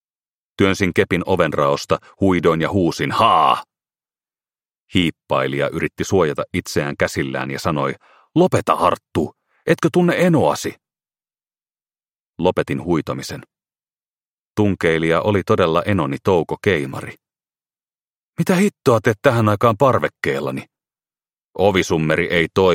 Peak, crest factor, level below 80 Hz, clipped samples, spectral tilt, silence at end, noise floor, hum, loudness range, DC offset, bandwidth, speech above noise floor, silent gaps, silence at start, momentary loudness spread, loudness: -2 dBFS; 18 dB; -50 dBFS; under 0.1%; -6 dB/octave; 0 s; under -90 dBFS; none; 4 LU; under 0.1%; 16.5 kHz; over 73 dB; 4.79-4.86 s, 12.11-12.33 s, 14.06-14.14 s, 14.27-14.54 s, 18.01-18.33 s, 21.44-21.49 s; 0.6 s; 9 LU; -18 LUFS